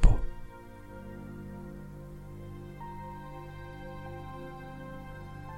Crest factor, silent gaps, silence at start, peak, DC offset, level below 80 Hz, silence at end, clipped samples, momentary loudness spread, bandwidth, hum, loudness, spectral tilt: 26 dB; none; 0 s; -6 dBFS; under 0.1%; -34 dBFS; 0 s; under 0.1%; 4 LU; 9.8 kHz; 50 Hz at -60 dBFS; -42 LUFS; -7 dB/octave